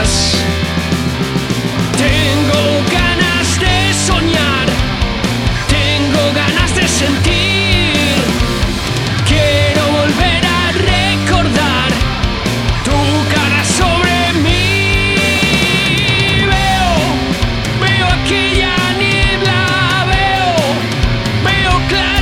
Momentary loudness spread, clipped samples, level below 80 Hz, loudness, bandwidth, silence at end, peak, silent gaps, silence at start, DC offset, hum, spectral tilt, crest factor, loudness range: 4 LU; under 0.1%; -22 dBFS; -12 LUFS; 16.5 kHz; 0 s; 0 dBFS; none; 0 s; under 0.1%; none; -4 dB/octave; 12 dB; 2 LU